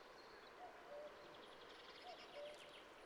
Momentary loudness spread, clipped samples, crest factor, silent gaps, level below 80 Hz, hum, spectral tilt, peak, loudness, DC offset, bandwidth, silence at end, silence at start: 4 LU; under 0.1%; 14 dB; none; -84 dBFS; none; -2.5 dB/octave; -44 dBFS; -58 LUFS; under 0.1%; 17 kHz; 0 s; 0 s